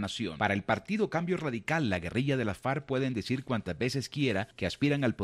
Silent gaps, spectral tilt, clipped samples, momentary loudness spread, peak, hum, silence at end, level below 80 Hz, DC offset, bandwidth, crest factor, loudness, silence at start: none; -6 dB/octave; under 0.1%; 4 LU; -12 dBFS; none; 0 s; -58 dBFS; under 0.1%; 13 kHz; 20 dB; -31 LUFS; 0 s